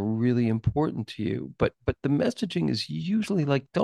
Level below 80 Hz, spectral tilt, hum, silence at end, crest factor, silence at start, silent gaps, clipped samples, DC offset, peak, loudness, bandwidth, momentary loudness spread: -48 dBFS; -7 dB/octave; none; 0 s; 16 dB; 0 s; none; under 0.1%; under 0.1%; -10 dBFS; -27 LUFS; 12 kHz; 6 LU